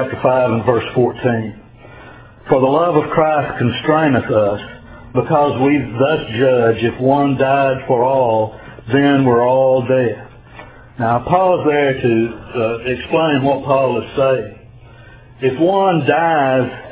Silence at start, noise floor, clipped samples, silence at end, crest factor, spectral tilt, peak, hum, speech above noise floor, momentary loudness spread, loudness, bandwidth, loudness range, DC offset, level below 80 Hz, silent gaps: 0 s; -40 dBFS; under 0.1%; 0 s; 16 dB; -11 dB/octave; 0 dBFS; none; 26 dB; 8 LU; -15 LUFS; 4 kHz; 2 LU; under 0.1%; -46 dBFS; none